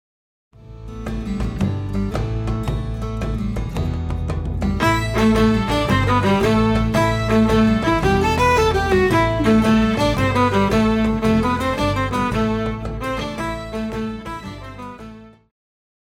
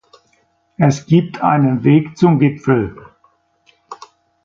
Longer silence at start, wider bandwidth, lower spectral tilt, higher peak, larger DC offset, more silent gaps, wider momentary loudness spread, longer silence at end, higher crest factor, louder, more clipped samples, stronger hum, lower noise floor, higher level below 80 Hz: second, 0.65 s vs 0.8 s; first, 16 kHz vs 7.6 kHz; second, -6.5 dB/octave vs -8 dB/octave; second, -4 dBFS vs 0 dBFS; neither; neither; second, 12 LU vs 18 LU; first, 0.75 s vs 0.5 s; about the same, 14 dB vs 16 dB; second, -19 LUFS vs -15 LUFS; neither; neither; second, -39 dBFS vs -60 dBFS; first, -30 dBFS vs -50 dBFS